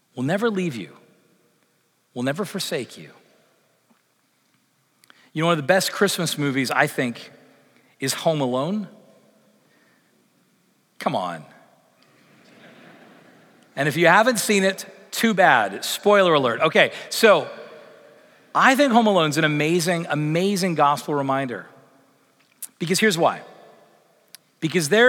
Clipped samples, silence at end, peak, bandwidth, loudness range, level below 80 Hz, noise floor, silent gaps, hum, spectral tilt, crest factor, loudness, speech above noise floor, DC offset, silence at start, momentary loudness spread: under 0.1%; 0 s; -2 dBFS; 19 kHz; 15 LU; -80 dBFS; -66 dBFS; none; none; -4 dB/octave; 20 dB; -20 LUFS; 46 dB; under 0.1%; 0.15 s; 19 LU